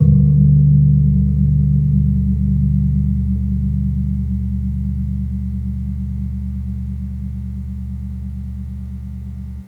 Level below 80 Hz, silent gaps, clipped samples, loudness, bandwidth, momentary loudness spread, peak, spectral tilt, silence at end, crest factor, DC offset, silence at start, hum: -24 dBFS; none; under 0.1%; -18 LUFS; 2 kHz; 16 LU; -2 dBFS; -12.5 dB/octave; 0 s; 16 dB; under 0.1%; 0 s; none